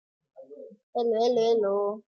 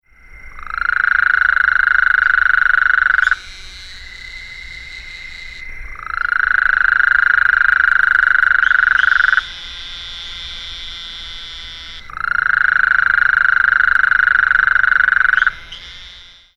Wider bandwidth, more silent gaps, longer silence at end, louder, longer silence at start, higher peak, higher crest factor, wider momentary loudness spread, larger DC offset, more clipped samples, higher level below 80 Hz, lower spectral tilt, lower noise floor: second, 6.8 kHz vs 8.6 kHz; first, 0.83-0.93 s vs none; second, 0.1 s vs 0.35 s; second, -26 LUFS vs -12 LUFS; about the same, 0.4 s vs 0.3 s; second, -14 dBFS vs 0 dBFS; about the same, 12 dB vs 16 dB; about the same, 20 LU vs 19 LU; neither; neither; second, -84 dBFS vs -38 dBFS; first, -5 dB/octave vs -1 dB/octave; first, -47 dBFS vs -40 dBFS